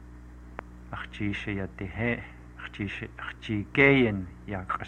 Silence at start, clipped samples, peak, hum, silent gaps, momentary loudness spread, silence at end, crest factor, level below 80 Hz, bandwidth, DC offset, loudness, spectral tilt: 0 s; under 0.1%; -8 dBFS; 60 Hz at -45 dBFS; none; 23 LU; 0 s; 22 dB; -48 dBFS; 9 kHz; under 0.1%; -28 LUFS; -7.5 dB/octave